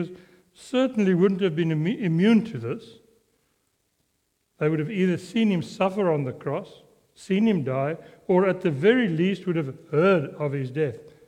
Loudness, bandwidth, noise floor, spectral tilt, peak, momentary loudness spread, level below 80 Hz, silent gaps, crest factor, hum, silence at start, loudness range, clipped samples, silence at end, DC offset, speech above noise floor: -24 LUFS; 10 kHz; -73 dBFS; -7.5 dB/octave; -6 dBFS; 10 LU; -68 dBFS; none; 18 dB; none; 0 s; 4 LU; under 0.1%; 0.2 s; under 0.1%; 49 dB